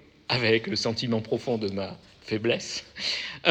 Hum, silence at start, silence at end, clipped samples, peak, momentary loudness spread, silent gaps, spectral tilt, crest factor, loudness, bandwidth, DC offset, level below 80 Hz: none; 0.3 s; 0 s; under 0.1%; -4 dBFS; 11 LU; none; -4.5 dB/octave; 24 dB; -27 LUFS; 9.8 kHz; under 0.1%; -62 dBFS